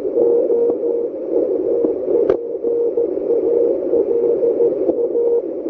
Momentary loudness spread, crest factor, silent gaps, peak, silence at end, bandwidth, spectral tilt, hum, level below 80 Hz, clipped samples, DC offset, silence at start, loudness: 4 LU; 14 dB; none; -2 dBFS; 0 s; 2.6 kHz; -10 dB/octave; none; -56 dBFS; under 0.1%; under 0.1%; 0 s; -18 LUFS